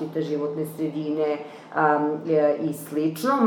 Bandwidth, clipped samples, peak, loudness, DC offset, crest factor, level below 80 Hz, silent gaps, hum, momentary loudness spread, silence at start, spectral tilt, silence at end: 19 kHz; under 0.1%; -8 dBFS; -25 LUFS; under 0.1%; 16 dB; -80 dBFS; none; none; 7 LU; 0 s; -6.5 dB/octave; 0 s